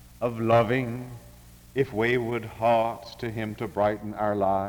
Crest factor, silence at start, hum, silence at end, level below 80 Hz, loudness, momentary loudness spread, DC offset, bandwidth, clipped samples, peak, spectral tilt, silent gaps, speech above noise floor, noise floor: 18 dB; 0.05 s; none; 0 s; -54 dBFS; -26 LUFS; 12 LU; under 0.1%; over 20 kHz; under 0.1%; -10 dBFS; -7 dB/octave; none; 24 dB; -49 dBFS